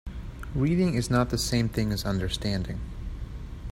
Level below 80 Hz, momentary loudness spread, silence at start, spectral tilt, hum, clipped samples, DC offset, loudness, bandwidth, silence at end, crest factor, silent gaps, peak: -38 dBFS; 15 LU; 0.05 s; -5.5 dB/octave; none; under 0.1%; under 0.1%; -27 LUFS; 16 kHz; 0 s; 18 dB; none; -10 dBFS